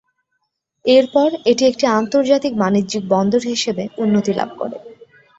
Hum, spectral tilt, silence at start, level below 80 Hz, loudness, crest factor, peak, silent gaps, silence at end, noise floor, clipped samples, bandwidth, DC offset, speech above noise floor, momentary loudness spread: none; -5 dB/octave; 0.85 s; -58 dBFS; -17 LUFS; 16 dB; -2 dBFS; none; 0.35 s; -72 dBFS; under 0.1%; 8 kHz; under 0.1%; 56 dB; 9 LU